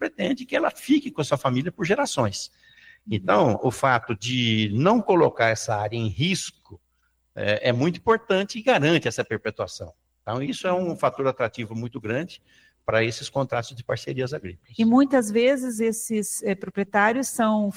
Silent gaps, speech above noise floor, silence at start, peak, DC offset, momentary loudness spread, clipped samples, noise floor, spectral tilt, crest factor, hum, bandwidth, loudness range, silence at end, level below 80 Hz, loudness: none; 46 dB; 0 s; -4 dBFS; under 0.1%; 12 LU; under 0.1%; -69 dBFS; -5 dB/octave; 20 dB; none; 16.5 kHz; 6 LU; 0 s; -58 dBFS; -24 LUFS